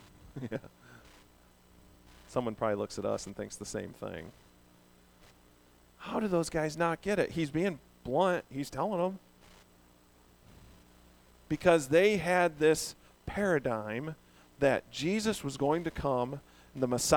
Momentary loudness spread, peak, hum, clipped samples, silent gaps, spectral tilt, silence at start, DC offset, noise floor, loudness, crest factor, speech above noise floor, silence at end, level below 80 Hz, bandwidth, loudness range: 16 LU; -10 dBFS; 60 Hz at -60 dBFS; under 0.1%; none; -5 dB/octave; 0.25 s; under 0.1%; -62 dBFS; -32 LUFS; 22 dB; 31 dB; 0 s; -58 dBFS; over 20 kHz; 10 LU